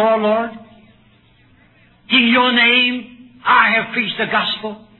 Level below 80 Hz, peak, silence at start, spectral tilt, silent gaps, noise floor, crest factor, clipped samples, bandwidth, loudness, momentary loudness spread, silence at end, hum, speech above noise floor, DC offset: -56 dBFS; 0 dBFS; 0 s; -6.5 dB/octave; none; -52 dBFS; 16 dB; under 0.1%; 4.3 kHz; -14 LUFS; 13 LU; 0.2 s; none; 36 dB; under 0.1%